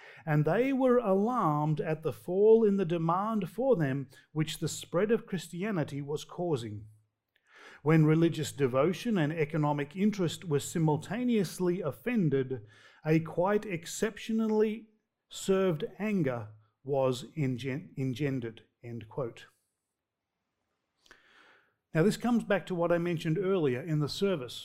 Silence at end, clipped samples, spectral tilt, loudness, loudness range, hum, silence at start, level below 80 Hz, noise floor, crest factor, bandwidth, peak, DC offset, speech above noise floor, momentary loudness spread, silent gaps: 0 s; under 0.1%; -6.5 dB/octave; -30 LUFS; 9 LU; none; 0 s; -64 dBFS; -87 dBFS; 20 dB; 16 kHz; -12 dBFS; under 0.1%; 57 dB; 11 LU; none